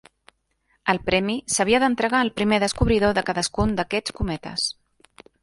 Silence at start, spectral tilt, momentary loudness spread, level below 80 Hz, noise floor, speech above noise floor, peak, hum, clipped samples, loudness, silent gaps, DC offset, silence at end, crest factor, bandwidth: 0.85 s; -4 dB/octave; 8 LU; -38 dBFS; -68 dBFS; 46 dB; -2 dBFS; none; under 0.1%; -22 LUFS; none; under 0.1%; 0.7 s; 22 dB; 11.5 kHz